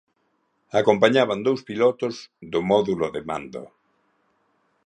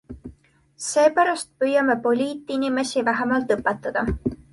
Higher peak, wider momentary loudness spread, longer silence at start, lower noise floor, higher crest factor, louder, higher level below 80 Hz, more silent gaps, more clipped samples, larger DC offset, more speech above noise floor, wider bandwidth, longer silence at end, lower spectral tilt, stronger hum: first, -2 dBFS vs -6 dBFS; first, 14 LU vs 8 LU; first, 0.75 s vs 0.1 s; first, -70 dBFS vs -55 dBFS; about the same, 22 dB vs 18 dB; about the same, -22 LUFS vs -22 LUFS; second, -60 dBFS vs -44 dBFS; neither; neither; neither; first, 48 dB vs 33 dB; second, 9.8 kHz vs 11.5 kHz; first, 1.2 s vs 0.15 s; about the same, -5.5 dB/octave vs -4.5 dB/octave; neither